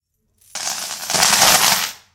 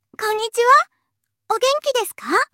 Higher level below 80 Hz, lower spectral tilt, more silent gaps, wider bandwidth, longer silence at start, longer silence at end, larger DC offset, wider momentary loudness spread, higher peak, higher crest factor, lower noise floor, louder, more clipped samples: first, -54 dBFS vs -68 dBFS; about the same, 0.5 dB/octave vs 0 dB/octave; neither; first, 19 kHz vs 17 kHz; first, 0.55 s vs 0.2 s; about the same, 0.2 s vs 0.1 s; neither; first, 14 LU vs 10 LU; about the same, 0 dBFS vs -2 dBFS; about the same, 18 dB vs 18 dB; second, -58 dBFS vs -76 dBFS; first, -14 LUFS vs -18 LUFS; neither